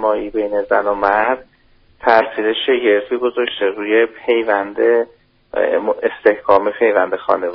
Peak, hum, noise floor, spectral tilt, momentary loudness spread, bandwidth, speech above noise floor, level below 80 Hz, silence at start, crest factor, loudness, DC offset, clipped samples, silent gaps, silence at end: 0 dBFS; none; -51 dBFS; -1 dB/octave; 6 LU; 5.6 kHz; 36 dB; -50 dBFS; 0 s; 16 dB; -16 LUFS; under 0.1%; under 0.1%; none; 0 s